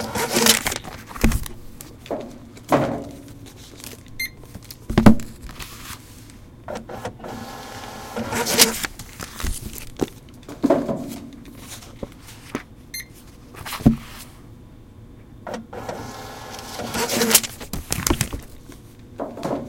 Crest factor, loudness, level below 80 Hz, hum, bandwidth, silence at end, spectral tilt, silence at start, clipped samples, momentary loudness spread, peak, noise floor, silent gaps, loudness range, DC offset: 24 dB; -22 LUFS; -36 dBFS; none; 17 kHz; 0 s; -3.5 dB/octave; 0 s; under 0.1%; 25 LU; 0 dBFS; -44 dBFS; none; 6 LU; under 0.1%